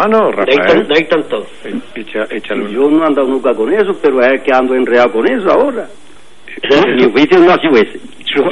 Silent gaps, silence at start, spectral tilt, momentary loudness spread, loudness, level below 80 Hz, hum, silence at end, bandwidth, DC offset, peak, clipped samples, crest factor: none; 0 s; -6 dB/octave; 14 LU; -11 LUFS; -50 dBFS; none; 0 s; 11 kHz; 3%; 0 dBFS; under 0.1%; 12 dB